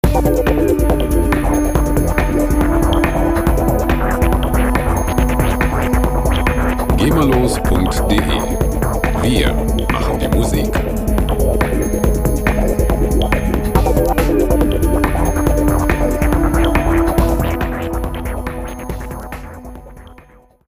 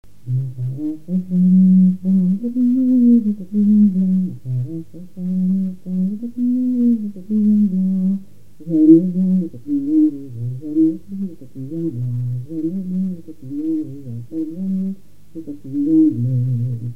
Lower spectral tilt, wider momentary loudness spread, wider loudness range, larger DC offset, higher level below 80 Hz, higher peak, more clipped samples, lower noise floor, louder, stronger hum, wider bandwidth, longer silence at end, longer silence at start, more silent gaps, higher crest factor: second, -6.5 dB/octave vs -12 dB/octave; second, 7 LU vs 16 LU; second, 2 LU vs 9 LU; second, under 0.1% vs 2%; first, -18 dBFS vs -60 dBFS; about the same, 0 dBFS vs 0 dBFS; neither; first, -45 dBFS vs -41 dBFS; about the same, -16 LUFS vs -18 LUFS; second, none vs 50 Hz at -55 dBFS; first, 16 kHz vs 1 kHz; first, 0.55 s vs 0 s; second, 0.05 s vs 0.25 s; neither; about the same, 14 dB vs 18 dB